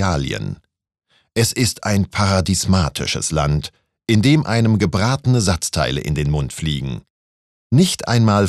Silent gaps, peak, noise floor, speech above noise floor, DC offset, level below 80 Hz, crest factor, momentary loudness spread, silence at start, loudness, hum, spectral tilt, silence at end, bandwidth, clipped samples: 7.10-7.70 s; -2 dBFS; under -90 dBFS; over 73 dB; under 0.1%; -36 dBFS; 16 dB; 10 LU; 0 s; -18 LUFS; none; -5 dB/octave; 0 s; 14 kHz; under 0.1%